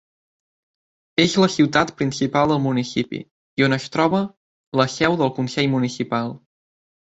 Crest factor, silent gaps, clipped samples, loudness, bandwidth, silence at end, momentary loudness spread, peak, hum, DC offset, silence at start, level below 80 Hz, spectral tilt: 20 dB; 3.31-3.57 s, 4.37-4.72 s; under 0.1%; -20 LUFS; 8.2 kHz; 0.65 s; 9 LU; -2 dBFS; none; under 0.1%; 1.2 s; -56 dBFS; -5.5 dB/octave